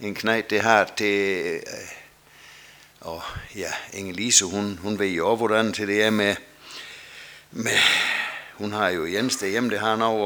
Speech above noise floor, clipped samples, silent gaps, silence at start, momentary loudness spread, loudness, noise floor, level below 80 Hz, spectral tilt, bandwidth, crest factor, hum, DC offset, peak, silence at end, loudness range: 26 dB; under 0.1%; none; 0 s; 20 LU; -22 LUFS; -50 dBFS; -58 dBFS; -2.5 dB/octave; over 20 kHz; 24 dB; none; under 0.1%; 0 dBFS; 0 s; 4 LU